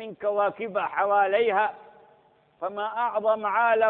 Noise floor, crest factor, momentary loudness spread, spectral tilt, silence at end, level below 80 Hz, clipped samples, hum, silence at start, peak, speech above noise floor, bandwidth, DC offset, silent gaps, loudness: -60 dBFS; 16 dB; 8 LU; -8 dB/octave; 0 s; -74 dBFS; under 0.1%; none; 0 s; -10 dBFS; 36 dB; 4.1 kHz; under 0.1%; none; -25 LUFS